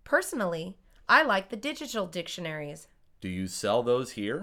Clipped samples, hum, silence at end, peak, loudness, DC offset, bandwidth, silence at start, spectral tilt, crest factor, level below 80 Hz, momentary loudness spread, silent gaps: under 0.1%; none; 0 s; -8 dBFS; -28 LUFS; under 0.1%; 18 kHz; 0.05 s; -4 dB/octave; 22 dB; -62 dBFS; 19 LU; none